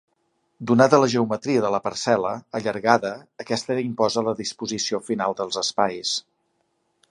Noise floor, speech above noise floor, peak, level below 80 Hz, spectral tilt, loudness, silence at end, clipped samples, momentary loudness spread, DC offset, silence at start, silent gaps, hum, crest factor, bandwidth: -71 dBFS; 49 dB; 0 dBFS; -66 dBFS; -4.5 dB/octave; -23 LUFS; 0.9 s; under 0.1%; 10 LU; under 0.1%; 0.6 s; none; none; 22 dB; 11.5 kHz